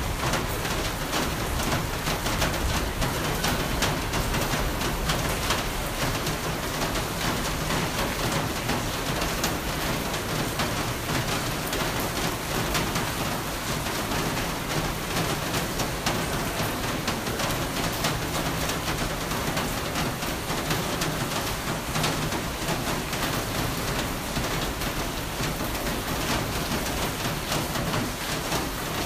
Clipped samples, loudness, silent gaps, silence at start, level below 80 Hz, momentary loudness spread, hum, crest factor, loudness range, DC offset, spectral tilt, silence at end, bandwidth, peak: under 0.1%; -27 LUFS; none; 0 s; -36 dBFS; 3 LU; none; 18 dB; 1 LU; under 0.1%; -3.5 dB/octave; 0 s; 15.5 kHz; -10 dBFS